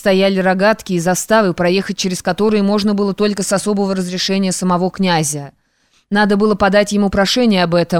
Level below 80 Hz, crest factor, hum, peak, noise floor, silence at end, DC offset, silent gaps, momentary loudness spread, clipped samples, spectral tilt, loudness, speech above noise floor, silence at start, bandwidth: -44 dBFS; 12 dB; none; -2 dBFS; -59 dBFS; 0 s; 0.5%; none; 5 LU; under 0.1%; -4.5 dB/octave; -15 LUFS; 44 dB; 0 s; 16.5 kHz